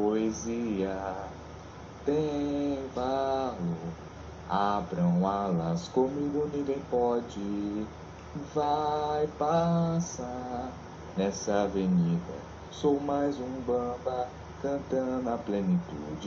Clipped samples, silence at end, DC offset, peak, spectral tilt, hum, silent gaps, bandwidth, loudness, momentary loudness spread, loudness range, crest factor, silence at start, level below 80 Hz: under 0.1%; 0 s; under 0.1%; -14 dBFS; -7 dB/octave; none; none; 7.4 kHz; -31 LUFS; 14 LU; 2 LU; 18 dB; 0 s; -52 dBFS